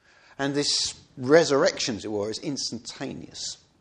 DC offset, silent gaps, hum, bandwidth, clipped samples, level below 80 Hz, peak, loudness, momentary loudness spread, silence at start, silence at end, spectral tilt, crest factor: under 0.1%; none; none; 10.5 kHz; under 0.1%; -62 dBFS; -4 dBFS; -25 LUFS; 15 LU; 0.4 s; 0.25 s; -3 dB/octave; 22 dB